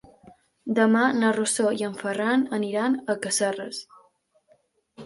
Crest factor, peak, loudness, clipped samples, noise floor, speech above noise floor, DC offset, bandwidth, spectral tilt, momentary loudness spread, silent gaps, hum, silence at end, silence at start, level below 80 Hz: 18 dB; -8 dBFS; -24 LUFS; under 0.1%; -64 dBFS; 40 dB; under 0.1%; 11.5 kHz; -3.5 dB/octave; 11 LU; none; none; 0 s; 0.65 s; -72 dBFS